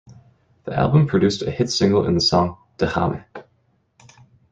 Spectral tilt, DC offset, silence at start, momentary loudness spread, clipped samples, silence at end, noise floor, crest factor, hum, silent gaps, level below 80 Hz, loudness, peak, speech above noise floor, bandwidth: -6 dB/octave; under 0.1%; 0.1 s; 9 LU; under 0.1%; 1.1 s; -64 dBFS; 18 dB; none; none; -48 dBFS; -19 LUFS; -2 dBFS; 45 dB; 9.4 kHz